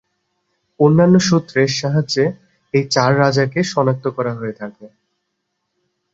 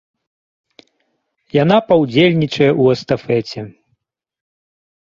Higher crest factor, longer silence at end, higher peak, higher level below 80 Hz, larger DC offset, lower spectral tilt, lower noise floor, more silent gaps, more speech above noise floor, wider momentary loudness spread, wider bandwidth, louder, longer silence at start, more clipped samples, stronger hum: about the same, 16 dB vs 16 dB; about the same, 1.25 s vs 1.35 s; about the same, 0 dBFS vs -2 dBFS; about the same, -56 dBFS vs -54 dBFS; neither; second, -5.5 dB/octave vs -7 dB/octave; first, -73 dBFS vs -68 dBFS; neither; first, 58 dB vs 54 dB; about the same, 11 LU vs 13 LU; about the same, 8 kHz vs 7.6 kHz; about the same, -16 LUFS vs -14 LUFS; second, 0.8 s vs 1.55 s; neither; neither